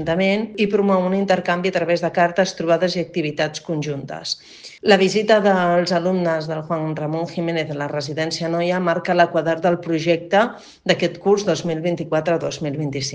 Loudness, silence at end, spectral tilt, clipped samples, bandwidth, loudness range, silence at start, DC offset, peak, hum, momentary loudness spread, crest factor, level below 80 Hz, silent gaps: -20 LUFS; 0 s; -5.5 dB/octave; under 0.1%; 9.6 kHz; 3 LU; 0 s; under 0.1%; 0 dBFS; none; 9 LU; 20 dB; -58 dBFS; none